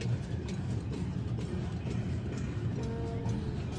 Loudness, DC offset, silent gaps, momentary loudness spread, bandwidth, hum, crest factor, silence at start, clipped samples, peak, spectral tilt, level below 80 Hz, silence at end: -36 LUFS; under 0.1%; none; 1 LU; 9.6 kHz; none; 12 dB; 0 s; under 0.1%; -22 dBFS; -7.5 dB/octave; -46 dBFS; 0 s